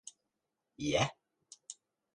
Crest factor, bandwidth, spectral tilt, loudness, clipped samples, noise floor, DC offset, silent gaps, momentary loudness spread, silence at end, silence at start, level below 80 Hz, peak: 24 dB; 11.5 kHz; -4 dB/octave; -34 LUFS; under 0.1%; -87 dBFS; under 0.1%; none; 22 LU; 0.45 s; 0.05 s; -64 dBFS; -16 dBFS